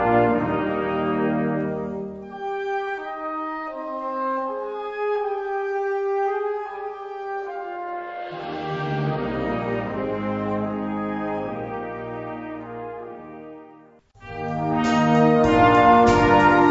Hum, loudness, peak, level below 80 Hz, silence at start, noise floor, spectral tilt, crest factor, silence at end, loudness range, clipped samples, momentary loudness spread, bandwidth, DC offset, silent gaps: none; -23 LUFS; -4 dBFS; -46 dBFS; 0 s; -50 dBFS; -7 dB/octave; 18 dB; 0 s; 10 LU; under 0.1%; 17 LU; 8 kHz; under 0.1%; none